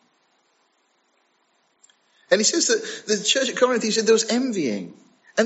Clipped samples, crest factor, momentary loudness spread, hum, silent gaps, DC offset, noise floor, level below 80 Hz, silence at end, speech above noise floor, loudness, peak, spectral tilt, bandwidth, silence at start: under 0.1%; 20 dB; 9 LU; none; none; under 0.1%; -66 dBFS; -82 dBFS; 0 s; 45 dB; -21 LUFS; -4 dBFS; -2 dB/octave; 8.2 kHz; 2.3 s